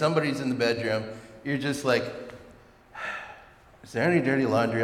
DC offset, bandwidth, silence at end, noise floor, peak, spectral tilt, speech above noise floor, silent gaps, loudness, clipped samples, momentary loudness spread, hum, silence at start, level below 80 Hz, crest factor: under 0.1%; 15.5 kHz; 0 s; -53 dBFS; -10 dBFS; -6 dB/octave; 27 dB; none; -27 LUFS; under 0.1%; 16 LU; none; 0 s; -62 dBFS; 18 dB